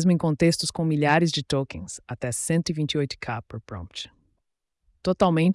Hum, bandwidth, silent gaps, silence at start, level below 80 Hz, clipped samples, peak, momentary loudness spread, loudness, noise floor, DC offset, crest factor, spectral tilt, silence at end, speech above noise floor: none; 12 kHz; none; 0 s; -54 dBFS; under 0.1%; -8 dBFS; 16 LU; -24 LUFS; -77 dBFS; under 0.1%; 16 dB; -5.5 dB/octave; 0 s; 53 dB